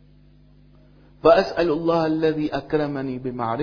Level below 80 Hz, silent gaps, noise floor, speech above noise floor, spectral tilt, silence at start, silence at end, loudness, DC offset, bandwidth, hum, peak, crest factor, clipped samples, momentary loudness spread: -48 dBFS; none; -52 dBFS; 31 dB; -7.5 dB/octave; 1.25 s; 0 s; -21 LUFS; under 0.1%; 5.4 kHz; 50 Hz at -50 dBFS; -2 dBFS; 20 dB; under 0.1%; 10 LU